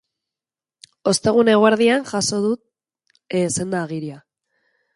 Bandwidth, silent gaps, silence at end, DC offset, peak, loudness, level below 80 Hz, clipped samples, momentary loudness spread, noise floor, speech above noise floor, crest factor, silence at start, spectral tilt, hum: 11.5 kHz; none; 0.75 s; under 0.1%; -2 dBFS; -19 LUFS; -60 dBFS; under 0.1%; 14 LU; under -90 dBFS; over 72 dB; 18 dB; 1.05 s; -4 dB/octave; none